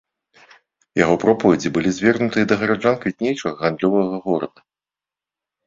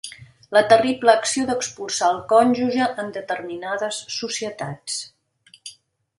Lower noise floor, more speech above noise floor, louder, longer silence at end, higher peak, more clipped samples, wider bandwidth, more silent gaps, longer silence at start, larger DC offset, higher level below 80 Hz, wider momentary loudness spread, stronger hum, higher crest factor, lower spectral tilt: first, -90 dBFS vs -55 dBFS; first, 71 dB vs 35 dB; about the same, -19 LUFS vs -21 LUFS; first, 1.2 s vs 0.45 s; about the same, -2 dBFS vs 0 dBFS; neither; second, 7.8 kHz vs 11.5 kHz; neither; first, 0.95 s vs 0.05 s; neither; first, -54 dBFS vs -62 dBFS; second, 7 LU vs 19 LU; neither; about the same, 18 dB vs 22 dB; first, -6 dB/octave vs -3 dB/octave